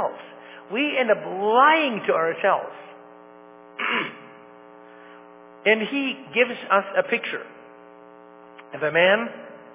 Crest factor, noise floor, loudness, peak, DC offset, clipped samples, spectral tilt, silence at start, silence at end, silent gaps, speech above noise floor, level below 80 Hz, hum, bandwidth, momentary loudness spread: 20 dB; -47 dBFS; -22 LUFS; -4 dBFS; under 0.1%; under 0.1%; -7.5 dB/octave; 0 s; 0 s; none; 25 dB; -82 dBFS; none; 3.9 kHz; 23 LU